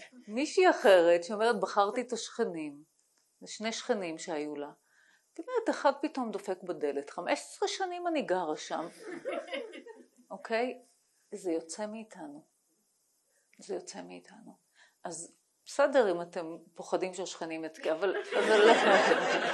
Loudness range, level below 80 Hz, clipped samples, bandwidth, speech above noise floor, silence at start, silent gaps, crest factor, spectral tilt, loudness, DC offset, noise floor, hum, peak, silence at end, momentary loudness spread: 14 LU; -86 dBFS; under 0.1%; 12.5 kHz; 44 dB; 0 s; none; 24 dB; -3 dB/octave; -30 LUFS; under 0.1%; -75 dBFS; none; -8 dBFS; 0 s; 22 LU